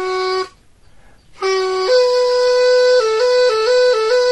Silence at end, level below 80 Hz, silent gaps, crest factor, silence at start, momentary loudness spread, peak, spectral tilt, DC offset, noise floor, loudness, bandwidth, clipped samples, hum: 0 s; -54 dBFS; none; 12 dB; 0 s; 8 LU; -4 dBFS; -1.5 dB/octave; 0.3%; -47 dBFS; -14 LUFS; 11 kHz; under 0.1%; none